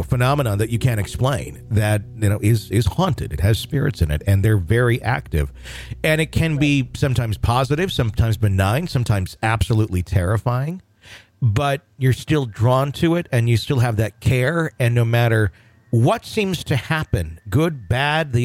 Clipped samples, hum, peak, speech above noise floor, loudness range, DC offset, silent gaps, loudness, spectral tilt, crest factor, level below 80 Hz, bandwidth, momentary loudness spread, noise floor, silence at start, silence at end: under 0.1%; none; -6 dBFS; 26 dB; 2 LU; under 0.1%; none; -20 LUFS; -6.5 dB/octave; 12 dB; -34 dBFS; 15.5 kHz; 5 LU; -45 dBFS; 0 s; 0 s